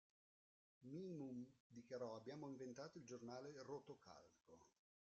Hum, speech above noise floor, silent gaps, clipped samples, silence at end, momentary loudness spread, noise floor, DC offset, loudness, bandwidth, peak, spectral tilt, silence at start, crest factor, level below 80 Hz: none; over 34 dB; 1.60-1.70 s; under 0.1%; 0.5 s; 11 LU; under -90 dBFS; under 0.1%; -56 LUFS; 7.6 kHz; -40 dBFS; -6 dB/octave; 0.8 s; 18 dB; under -90 dBFS